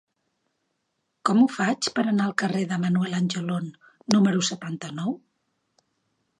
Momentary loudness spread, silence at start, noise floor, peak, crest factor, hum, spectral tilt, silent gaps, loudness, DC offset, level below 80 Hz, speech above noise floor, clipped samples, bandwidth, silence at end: 12 LU; 1.25 s; -77 dBFS; 0 dBFS; 26 dB; none; -5 dB/octave; none; -24 LUFS; under 0.1%; -72 dBFS; 53 dB; under 0.1%; 11 kHz; 1.25 s